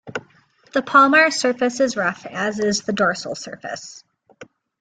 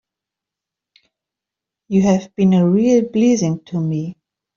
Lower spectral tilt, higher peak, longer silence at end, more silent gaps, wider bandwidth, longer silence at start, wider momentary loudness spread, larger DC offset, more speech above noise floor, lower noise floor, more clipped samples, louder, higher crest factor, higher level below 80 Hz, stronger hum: second, -3.5 dB/octave vs -7.5 dB/octave; about the same, -2 dBFS vs -4 dBFS; about the same, 0.35 s vs 0.45 s; neither; first, 9.6 kHz vs 7.4 kHz; second, 0.05 s vs 1.9 s; first, 19 LU vs 9 LU; neither; second, 36 dB vs 70 dB; second, -55 dBFS vs -85 dBFS; neither; about the same, -18 LUFS vs -16 LUFS; about the same, 20 dB vs 16 dB; second, -64 dBFS vs -56 dBFS; neither